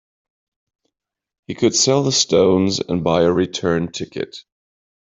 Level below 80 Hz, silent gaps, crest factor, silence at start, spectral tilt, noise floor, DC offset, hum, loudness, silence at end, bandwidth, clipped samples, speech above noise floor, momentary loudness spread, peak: -54 dBFS; none; 16 dB; 1.5 s; -4 dB/octave; -79 dBFS; under 0.1%; none; -17 LUFS; 0.75 s; 8.2 kHz; under 0.1%; 62 dB; 13 LU; -2 dBFS